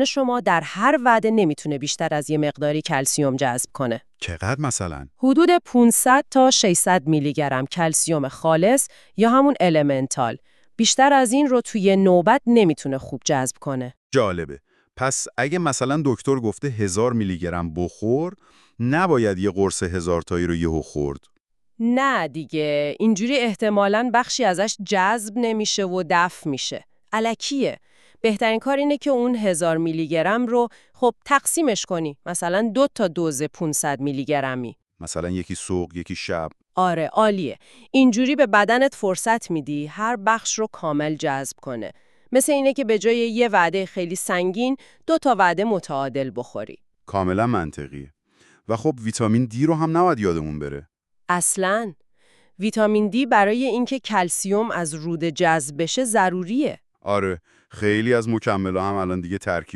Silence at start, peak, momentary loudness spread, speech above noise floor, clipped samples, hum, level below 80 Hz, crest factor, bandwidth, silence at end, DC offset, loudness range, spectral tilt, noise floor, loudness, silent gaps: 0 s; -2 dBFS; 11 LU; 40 dB; under 0.1%; none; -52 dBFS; 18 dB; 13.5 kHz; 0.1 s; 0.1%; 6 LU; -4.5 dB/octave; -61 dBFS; -21 LUFS; 13.97-14.10 s, 21.40-21.44 s